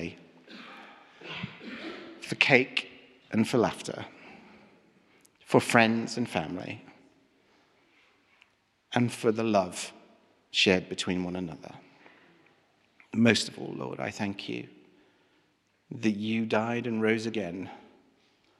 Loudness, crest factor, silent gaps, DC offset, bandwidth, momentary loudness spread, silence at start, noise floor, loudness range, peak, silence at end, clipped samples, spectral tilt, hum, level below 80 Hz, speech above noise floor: -28 LUFS; 28 dB; none; under 0.1%; 13 kHz; 23 LU; 0 s; -70 dBFS; 4 LU; -4 dBFS; 0.8 s; under 0.1%; -4.5 dB/octave; none; -70 dBFS; 42 dB